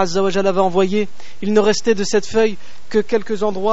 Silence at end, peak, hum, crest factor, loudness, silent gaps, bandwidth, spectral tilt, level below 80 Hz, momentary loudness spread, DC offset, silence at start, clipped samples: 0 s; -2 dBFS; none; 16 dB; -18 LUFS; none; 8 kHz; -4.5 dB/octave; -52 dBFS; 6 LU; 8%; 0 s; under 0.1%